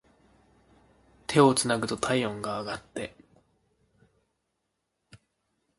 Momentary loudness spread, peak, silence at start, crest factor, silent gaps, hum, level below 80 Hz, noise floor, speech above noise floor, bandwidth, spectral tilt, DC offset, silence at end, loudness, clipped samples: 17 LU; -6 dBFS; 1.3 s; 26 dB; none; none; -62 dBFS; -80 dBFS; 54 dB; 12 kHz; -4.5 dB/octave; under 0.1%; 2.7 s; -27 LUFS; under 0.1%